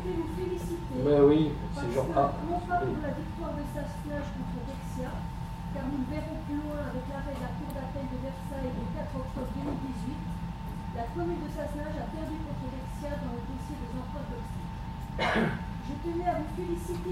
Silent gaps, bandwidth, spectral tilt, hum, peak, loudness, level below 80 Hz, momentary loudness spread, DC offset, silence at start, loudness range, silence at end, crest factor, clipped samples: none; 16 kHz; -7.5 dB/octave; none; -10 dBFS; -33 LUFS; -42 dBFS; 10 LU; under 0.1%; 0 s; 8 LU; 0 s; 22 dB; under 0.1%